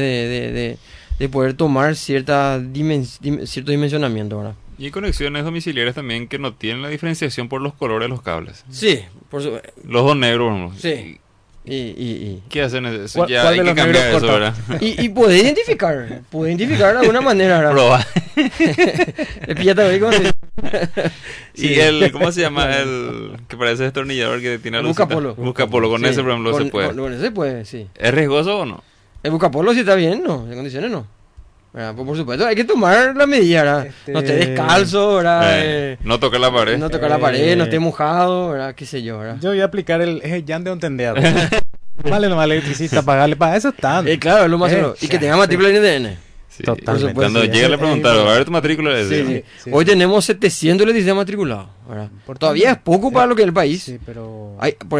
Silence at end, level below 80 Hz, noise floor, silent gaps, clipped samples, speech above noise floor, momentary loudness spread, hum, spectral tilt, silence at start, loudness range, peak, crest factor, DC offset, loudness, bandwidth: 0 s; -40 dBFS; -44 dBFS; none; under 0.1%; 28 dB; 14 LU; none; -5.5 dB/octave; 0 s; 7 LU; -2 dBFS; 14 dB; under 0.1%; -16 LUFS; 11 kHz